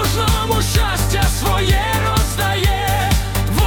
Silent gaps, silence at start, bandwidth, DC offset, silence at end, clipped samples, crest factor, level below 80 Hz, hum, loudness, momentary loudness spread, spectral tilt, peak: none; 0 s; 18 kHz; under 0.1%; 0 s; under 0.1%; 14 dB; -22 dBFS; none; -17 LUFS; 2 LU; -4 dB/octave; -2 dBFS